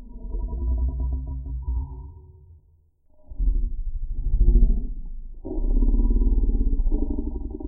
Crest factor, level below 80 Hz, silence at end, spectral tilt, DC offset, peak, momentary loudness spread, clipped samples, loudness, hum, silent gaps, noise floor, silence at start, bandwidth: 16 dB; -22 dBFS; 0 s; -16.5 dB/octave; under 0.1%; -6 dBFS; 14 LU; under 0.1%; -28 LUFS; none; none; -59 dBFS; 0 s; 1 kHz